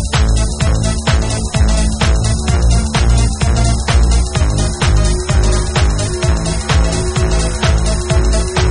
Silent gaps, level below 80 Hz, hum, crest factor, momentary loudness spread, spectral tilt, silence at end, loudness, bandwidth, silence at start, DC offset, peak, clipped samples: none; -14 dBFS; none; 12 dB; 2 LU; -5 dB/octave; 0 s; -14 LUFS; 11 kHz; 0 s; under 0.1%; 0 dBFS; under 0.1%